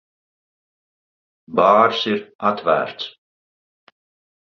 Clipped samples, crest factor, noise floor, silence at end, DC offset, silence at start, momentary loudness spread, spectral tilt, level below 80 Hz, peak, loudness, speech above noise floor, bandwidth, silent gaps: under 0.1%; 20 dB; under -90 dBFS; 1.3 s; under 0.1%; 1.5 s; 15 LU; -5.5 dB/octave; -64 dBFS; -2 dBFS; -18 LUFS; over 72 dB; 6.8 kHz; 2.35-2.39 s